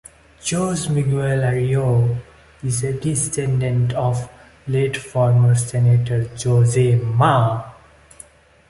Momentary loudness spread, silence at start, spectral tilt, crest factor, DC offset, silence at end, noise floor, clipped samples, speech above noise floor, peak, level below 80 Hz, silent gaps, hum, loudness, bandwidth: 10 LU; 0.45 s; -6 dB/octave; 16 dB; under 0.1%; 1 s; -46 dBFS; under 0.1%; 29 dB; -2 dBFS; -46 dBFS; none; none; -19 LUFS; 11.5 kHz